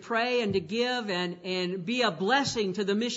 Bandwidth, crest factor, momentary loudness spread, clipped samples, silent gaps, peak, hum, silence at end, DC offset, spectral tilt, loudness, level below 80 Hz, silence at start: 8 kHz; 16 dB; 6 LU; under 0.1%; none; -12 dBFS; none; 0 s; under 0.1%; -4 dB/octave; -28 LUFS; -66 dBFS; 0 s